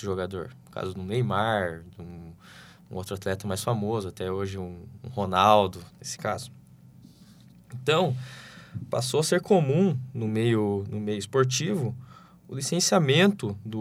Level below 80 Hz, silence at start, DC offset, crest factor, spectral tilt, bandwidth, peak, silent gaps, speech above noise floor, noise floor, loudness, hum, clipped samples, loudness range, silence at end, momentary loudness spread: -62 dBFS; 0 s; under 0.1%; 22 dB; -5 dB/octave; 16 kHz; -4 dBFS; none; 26 dB; -52 dBFS; -26 LUFS; none; under 0.1%; 6 LU; 0 s; 20 LU